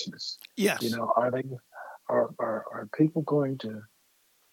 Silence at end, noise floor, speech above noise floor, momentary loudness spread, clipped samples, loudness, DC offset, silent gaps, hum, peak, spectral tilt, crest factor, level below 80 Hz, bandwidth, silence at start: 0.7 s; -67 dBFS; 39 dB; 14 LU; under 0.1%; -29 LUFS; under 0.1%; none; none; -10 dBFS; -5.5 dB/octave; 20 dB; -82 dBFS; 17.5 kHz; 0 s